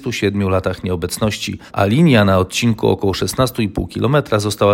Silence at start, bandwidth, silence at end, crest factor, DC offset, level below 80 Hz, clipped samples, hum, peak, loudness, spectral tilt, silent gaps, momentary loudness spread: 0 s; 16.5 kHz; 0 s; 16 dB; under 0.1%; -40 dBFS; under 0.1%; none; 0 dBFS; -17 LUFS; -5.5 dB/octave; none; 9 LU